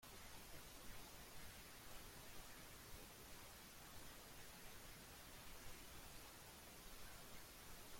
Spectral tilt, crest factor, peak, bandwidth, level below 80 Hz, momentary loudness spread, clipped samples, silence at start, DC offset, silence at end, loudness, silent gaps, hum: -2.5 dB/octave; 16 dB; -42 dBFS; 16.5 kHz; -66 dBFS; 1 LU; under 0.1%; 0 s; under 0.1%; 0 s; -58 LUFS; none; none